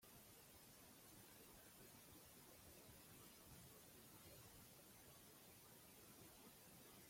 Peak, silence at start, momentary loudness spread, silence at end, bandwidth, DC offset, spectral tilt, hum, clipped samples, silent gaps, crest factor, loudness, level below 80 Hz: -52 dBFS; 0 s; 1 LU; 0 s; 16.5 kHz; under 0.1%; -3 dB/octave; none; under 0.1%; none; 14 dB; -64 LUFS; -80 dBFS